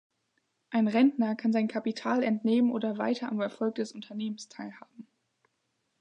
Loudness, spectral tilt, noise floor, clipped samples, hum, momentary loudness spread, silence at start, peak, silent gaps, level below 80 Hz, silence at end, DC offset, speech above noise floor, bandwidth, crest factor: -29 LUFS; -6.5 dB/octave; -78 dBFS; under 0.1%; none; 12 LU; 0.7 s; -14 dBFS; none; -84 dBFS; 1 s; under 0.1%; 50 dB; 9 kHz; 18 dB